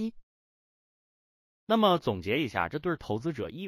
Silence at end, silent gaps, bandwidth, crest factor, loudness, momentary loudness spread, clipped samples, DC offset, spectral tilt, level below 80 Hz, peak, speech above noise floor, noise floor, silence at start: 0 s; 0.23-1.67 s; 15.5 kHz; 20 dB; -29 LUFS; 9 LU; under 0.1%; under 0.1%; -6.5 dB/octave; -60 dBFS; -12 dBFS; over 61 dB; under -90 dBFS; 0 s